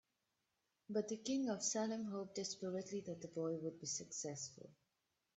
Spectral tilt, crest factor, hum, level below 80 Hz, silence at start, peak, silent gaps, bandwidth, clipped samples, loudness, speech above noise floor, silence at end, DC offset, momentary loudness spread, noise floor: -4 dB/octave; 18 dB; none; -86 dBFS; 0.9 s; -26 dBFS; none; 8.2 kHz; under 0.1%; -44 LUFS; 44 dB; 0.65 s; under 0.1%; 9 LU; -88 dBFS